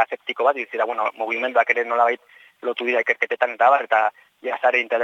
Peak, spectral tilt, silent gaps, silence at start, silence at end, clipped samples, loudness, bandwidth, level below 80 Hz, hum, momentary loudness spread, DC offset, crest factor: -2 dBFS; -2.5 dB/octave; none; 0 s; 0 s; under 0.1%; -21 LUFS; 7.4 kHz; -88 dBFS; none; 9 LU; under 0.1%; 20 dB